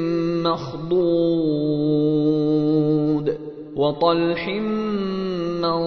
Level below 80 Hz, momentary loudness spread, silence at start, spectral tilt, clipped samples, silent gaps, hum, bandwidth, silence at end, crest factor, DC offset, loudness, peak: -52 dBFS; 6 LU; 0 s; -8.5 dB/octave; under 0.1%; none; none; 6.2 kHz; 0 s; 14 dB; under 0.1%; -21 LUFS; -6 dBFS